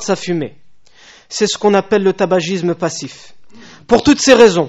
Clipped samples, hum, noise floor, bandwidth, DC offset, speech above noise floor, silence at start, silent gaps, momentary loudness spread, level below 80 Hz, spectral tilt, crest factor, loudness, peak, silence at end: 0.3%; none; -44 dBFS; 8.2 kHz; 0.6%; 31 dB; 0 s; none; 16 LU; -44 dBFS; -4.5 dB/octave; 14 dB; -13 LUFS; 0 dBFS; 0 s